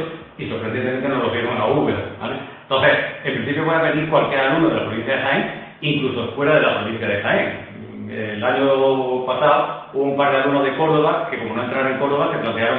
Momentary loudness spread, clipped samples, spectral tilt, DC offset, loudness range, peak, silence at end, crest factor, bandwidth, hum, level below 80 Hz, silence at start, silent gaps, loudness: 11 LU; under 0.1%; -9 dB/octave; under 0.1%; 2 LU; -2 dBFS; 0 s; 16 dB; 4.6 kHz; none; -56 dBFS; 0 s; none; -19 LUFS